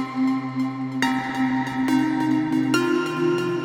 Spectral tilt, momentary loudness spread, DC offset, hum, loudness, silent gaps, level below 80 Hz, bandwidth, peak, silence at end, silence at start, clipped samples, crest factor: -5.5 dB/octave; 4 LU; under 0.1%; none; -23 LUFS; none; -60 dBFS; 16 kHz; -6 dBFS; 0 s; 0 s; under 0.1%; 16 dB